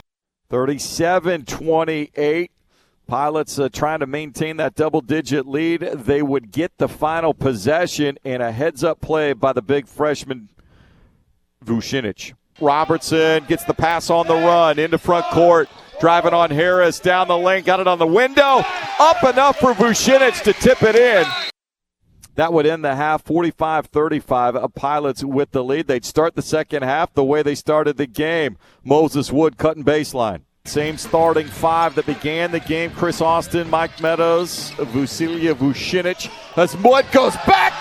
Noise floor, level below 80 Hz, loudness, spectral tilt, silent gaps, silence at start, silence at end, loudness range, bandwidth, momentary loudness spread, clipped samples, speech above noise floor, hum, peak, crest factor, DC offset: -82 dBFS; -48 dBFS; -18 LUFS; -5 dB/octave; none; 0.5 s; 0 s; 7 LU; 14.5 kHz; 10 LU; under 0.1%; 65 dB; none; 0 dBFS; 18 dB; under 0.1%